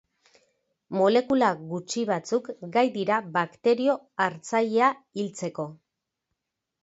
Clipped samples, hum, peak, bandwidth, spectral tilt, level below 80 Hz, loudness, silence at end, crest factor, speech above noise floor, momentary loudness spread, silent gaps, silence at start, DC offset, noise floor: under 0.1%; none; -8 dBFS; 8 kHz; -5 dB/octave; -72 dBFS; -26 LUFS; 1.1 s; 18 dB; 57 dB; 11 LU; none; 0.9 s; under 0.1%; -83 dBFS